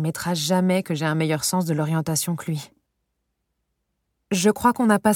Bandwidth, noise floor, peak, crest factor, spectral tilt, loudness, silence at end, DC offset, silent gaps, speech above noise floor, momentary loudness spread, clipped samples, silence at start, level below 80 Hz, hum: 18.5 kHz; -76 dBFS; -4 dBFS; 20 dB; -5 dB/octave; -22 LUFS; 0 s; under 0.1%; none; 55 dB; 8 LU; under 0.1%; 0 s; -60 dBFS; none